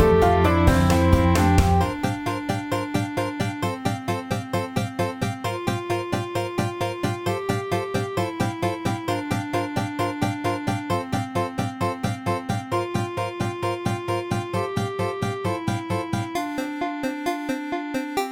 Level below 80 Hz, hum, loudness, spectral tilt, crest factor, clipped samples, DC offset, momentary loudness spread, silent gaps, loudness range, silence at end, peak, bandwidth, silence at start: -36 dBFS; none; -24 LUFS; -6 dB/octave; 22 dB; under 0.1%; under 0.1%; 9 LU; none; 5 LU; 0 s; 0 dBFS; 17 kHz; 0 s